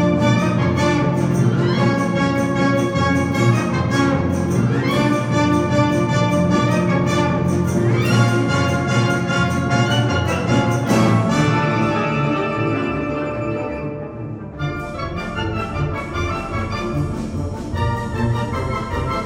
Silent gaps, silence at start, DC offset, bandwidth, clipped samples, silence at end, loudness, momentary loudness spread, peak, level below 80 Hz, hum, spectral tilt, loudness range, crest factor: none; 0 s; under 0.1%; 16 kHz; under 0.1%; 0 s; -19 LUFS; 8 LU; -2 dBFS; -38 dBFS; none; -6.5 dB/octave; 7 LU; 16 dB